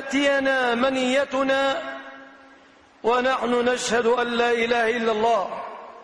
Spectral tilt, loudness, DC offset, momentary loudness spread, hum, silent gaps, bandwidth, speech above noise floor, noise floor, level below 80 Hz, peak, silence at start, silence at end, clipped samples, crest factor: -3 dB/octave; -22 LUFS; under 0.1%; 11 LU; none; none; 10.5 kHz; 31 dB; -52 dBFS; -58 dBFS; -10 dBFS; 0 s; 0 s; under 0.1%; 12 dB